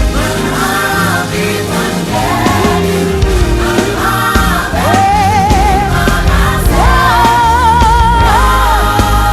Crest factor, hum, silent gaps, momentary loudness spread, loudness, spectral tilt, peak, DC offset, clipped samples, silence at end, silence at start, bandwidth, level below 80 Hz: 10 dB; none; none; 5 LU; -10 LUFS; -5 dB/octave; 0 dBFS; under 0.1%; under 0.1%; 0 s; 0 s; 16 kHz; -16 dBFS